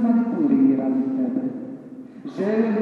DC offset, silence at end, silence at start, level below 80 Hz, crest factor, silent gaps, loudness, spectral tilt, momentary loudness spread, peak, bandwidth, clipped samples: under 0.1%; 0 s; 0 s; -74 dBFS; 14 dB; none; -21 LUFS; -9.5 dB/octave; 19 LU; -8 dBFS; 4.6 kHz; under 0.1%